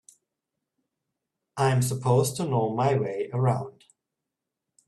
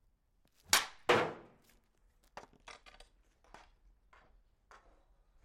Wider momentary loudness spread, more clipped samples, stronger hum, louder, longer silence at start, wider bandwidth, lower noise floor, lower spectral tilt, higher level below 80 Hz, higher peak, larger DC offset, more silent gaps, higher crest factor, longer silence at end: second, 7 LU vs 25 LU; neither; neither; first, -25 LUFS vs -32 LUFS; first, 1.55 s vs 0.7 s; second, 13 kHz vs 16.5 kHz; first, -86 dBFS vs -73 dBFS; first, -6 dB/octave vs -1.5 dB/octave; first, -62 dBFS vs -68 dBFS; about the same, -10 dBFS vs -10 dBFS; neither; neither; second, 18 dB vs 30 dB; second, 1.2 s vs 2.7 s